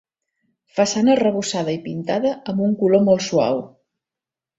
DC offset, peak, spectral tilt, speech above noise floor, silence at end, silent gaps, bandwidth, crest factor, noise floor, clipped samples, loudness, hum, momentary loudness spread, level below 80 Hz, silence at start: under 0.1%; -4 dBFS; -5.5 dB/octave; 70 dB; 0.9 s; none; 8 kHz; 16 dB; -88 dBFS; under 0.1%; -19 LUFS; none; 9 LU; -60 dBFS; 0.75 s